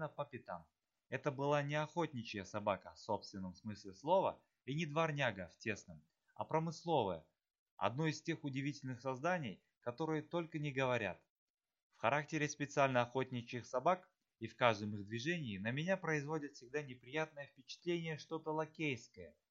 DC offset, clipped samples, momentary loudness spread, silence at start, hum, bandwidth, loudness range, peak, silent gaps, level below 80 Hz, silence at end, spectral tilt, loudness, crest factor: under 0.1%; under 0.1%; 13 LU; 0 s; none; 7.6 kHz; 3 LU; -16 dBFS; 7.59-7.77 s, 11.30-11.54 s, 11.83-11.90 s; -80 dBFS; 0.2 s; -5.5 dB/octave; -41 LUFS; 24 dB